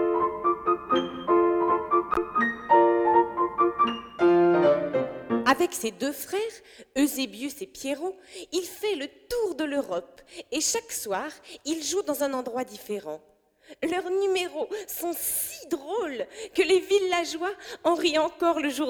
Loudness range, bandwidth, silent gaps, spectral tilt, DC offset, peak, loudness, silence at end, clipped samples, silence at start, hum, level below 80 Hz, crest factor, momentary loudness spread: 8 LU; over 20 kHz; none; -3 dB/octave; under 0.1%; -8 dBFS; -26 LUFS; 0 s; under 0.1%; 0 s; none; -60 dBFS; 18 dB; 12 LU